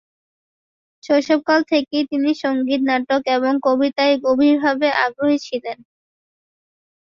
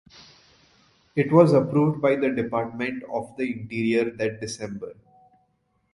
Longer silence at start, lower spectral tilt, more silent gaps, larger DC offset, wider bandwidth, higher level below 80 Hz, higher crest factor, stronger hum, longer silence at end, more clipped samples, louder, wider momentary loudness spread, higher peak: about the same, 1.05 s vs 1.15 s; second, -4 dB/octave vs -7 dB/octave; neither; neither; second, 7.2 kHz vs 11.5 kHz; about the same, -64 dBFS vs -62 dBFS; about the same, 16 dB vs 20 dB; neither; first, 1.3 s vs 1 s; neither; first, -18 LUFS vs -24 LUFS; second, 6 LU vs 15 LU; about the same, -2 dBFS vs -4 dBFS